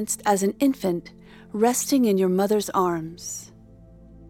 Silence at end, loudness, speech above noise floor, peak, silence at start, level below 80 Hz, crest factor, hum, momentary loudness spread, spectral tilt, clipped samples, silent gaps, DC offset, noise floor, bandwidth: 0 s; -23 LUFS; 26 dB; -6 dBFS; 0 s; -56 dBFS; 18 dB; none; 13 LU; -4.5 dB/octave; under 0.1%; none; under 0.1%; -48 dBFS; 17.5 kHz